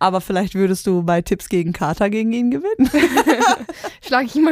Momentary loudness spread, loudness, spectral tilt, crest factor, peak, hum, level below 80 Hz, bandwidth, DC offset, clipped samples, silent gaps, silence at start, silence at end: 6 LU; -18 LUFS; -5.5 dB/octave; 16 dB; 0 dBFS; none; -44 dBFS; 16 kHz; under 0.1%; under 0.1%; none; 0 s; 0 s